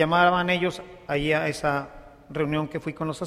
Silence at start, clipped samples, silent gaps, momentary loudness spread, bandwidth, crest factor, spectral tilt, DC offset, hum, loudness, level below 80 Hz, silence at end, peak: 0 s; under 0.1%; none; 13 LU; 15 kHz; 18 dB; -5.5 dB/octave; under 0.1%; none; -25 LUFS; -50 dBFS; 0 s; -6 dBFS